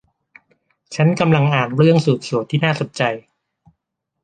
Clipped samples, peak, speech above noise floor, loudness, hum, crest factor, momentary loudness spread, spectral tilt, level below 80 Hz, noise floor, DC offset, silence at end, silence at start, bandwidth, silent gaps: under 0.1%; 0 dBFS; 60 dB; -17 LUFS; none; 18 dB; 7 LU; -7 dB/octave; -58 dBFS; -77 dBFS; under 0.1%; 1.05 s; 0.9 s; 9.2 kHz; none